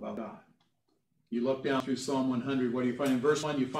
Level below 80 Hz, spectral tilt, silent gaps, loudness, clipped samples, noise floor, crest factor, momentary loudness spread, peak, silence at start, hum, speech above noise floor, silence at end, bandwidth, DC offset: -76 dBFS; -5.5 dB/octave; none; -31 LUFS; under 0.1%; -77 dBFS; 18 dB; 11 LU; -14 dBFS; 0 s; none; 47 dB; 0 s; 13.5 kHz; under 0.1%